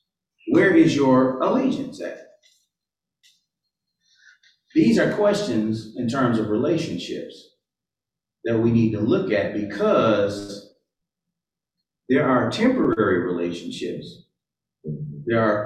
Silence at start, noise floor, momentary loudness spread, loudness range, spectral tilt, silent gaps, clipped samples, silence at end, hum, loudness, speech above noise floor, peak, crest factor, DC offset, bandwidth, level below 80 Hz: 0.45 s; -88 dBFS; 16 LU; 4 LU; -6.5 dB/octave; none; under 0.1%; 0 s; none; -21 LUFS; 68 dB; -6 dBFS; 16 dB; under 0.1%; 10.5 kHz; -56 dBFS